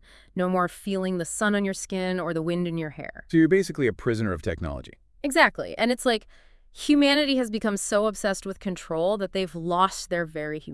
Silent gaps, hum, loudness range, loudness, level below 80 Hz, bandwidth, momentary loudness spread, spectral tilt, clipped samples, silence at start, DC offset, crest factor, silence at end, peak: none; none; 3 LU; -25 LUFS; -50 dBFS; 12 kHz; 12 LU; -4.5 dB/octave; under 0.1%; 0.35 s; under 0.1%; 22 dB; 0 s; -4 dBFS